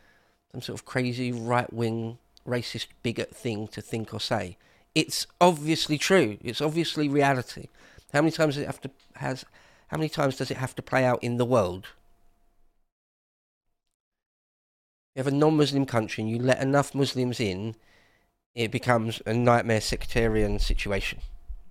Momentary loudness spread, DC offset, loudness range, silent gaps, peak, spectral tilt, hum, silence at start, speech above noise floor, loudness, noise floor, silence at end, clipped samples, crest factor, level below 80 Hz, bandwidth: 15 LU; under 0.1%; 6 LU; 12.92-13.61 s, 13.94-14.12 s, 14.26-15.13 s, 18.46-18.54 s; -6 dBFS; -5.5 dB/octave; none; 0.55 s; 38 dB; -27 LUFS; -64 dBFS; 0 s; under 0.1%; 22 dB; -42 dBFS; 16 kHz